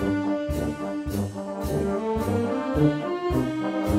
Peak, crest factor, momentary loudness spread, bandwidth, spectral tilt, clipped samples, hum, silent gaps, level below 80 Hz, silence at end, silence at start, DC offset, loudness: -8 dBFS; 18 dB; 7 LU; 16 kHz; -7.5 dB/octave; under 0.1%; none; none; -40 dBFS; 0 s; 0 s; under 0.1%; -26 LUFS